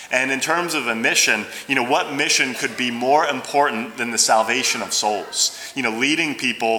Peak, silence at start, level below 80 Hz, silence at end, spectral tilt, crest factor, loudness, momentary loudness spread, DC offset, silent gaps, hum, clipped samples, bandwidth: -2 dBFS; 0 s; -70 dBFS; 0 s; -1 dB/octave; 18 dB; -19 LUFS; 6 LU; under 0.1%; none; none; under 0.1%; over 20 kHz